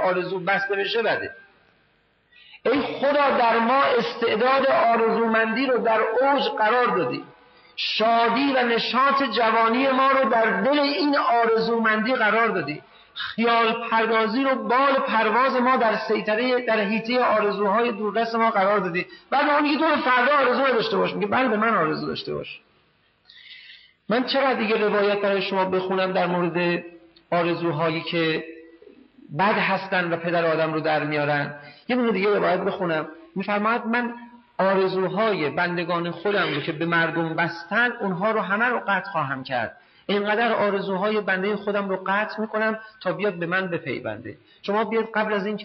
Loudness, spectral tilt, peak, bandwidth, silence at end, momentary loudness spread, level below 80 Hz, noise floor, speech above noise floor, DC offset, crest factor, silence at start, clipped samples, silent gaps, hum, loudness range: -22 LUFS; -3 dB/octave; -10 dBFS; 6 kHz; 0 s; 9 LU; -68 dBFS; -64 dBFS; 42 dB; under 0.1%; 12 dB; 0 s; under 0.1%; none; none; 5 LU